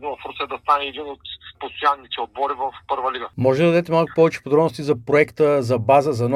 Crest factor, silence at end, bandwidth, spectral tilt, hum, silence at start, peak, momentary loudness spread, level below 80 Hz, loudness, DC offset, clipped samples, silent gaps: 18 dB; 0 s; 13 kHz; -6.5 dB/octave; none; 0 s; -2 dBFS; 14 LU; -56 dBFS; -20 LUFS; under 0.1%; under 0.1%; none